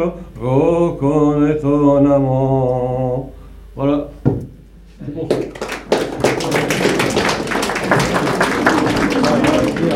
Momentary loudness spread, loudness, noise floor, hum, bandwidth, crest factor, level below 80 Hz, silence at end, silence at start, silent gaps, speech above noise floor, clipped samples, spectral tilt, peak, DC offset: 11 LU; -16 LUFS; -40 dBFS; none; 16 kHz; 16 dB; -38 dBFS; 0 s; 0 s; none; 25 dB; under 0.1%; -5.5 dB/octave; 0 dBFS; under 0.1%